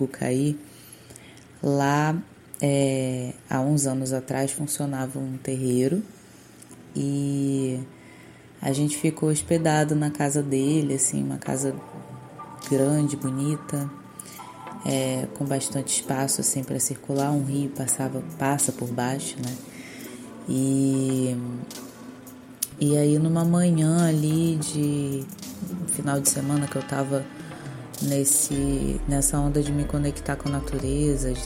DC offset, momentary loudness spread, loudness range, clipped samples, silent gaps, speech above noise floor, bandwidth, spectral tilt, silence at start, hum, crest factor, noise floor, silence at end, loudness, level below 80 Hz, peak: under 0.1%; 17 LU; 5 LU; under 0.1%; none; 24 dB; 16.5 kHz; -5 dB/octave; 0 s; none; 20 dB; -48 dBFS; 0 s; -25 LUFS; -42 dBFS; -4 dBFS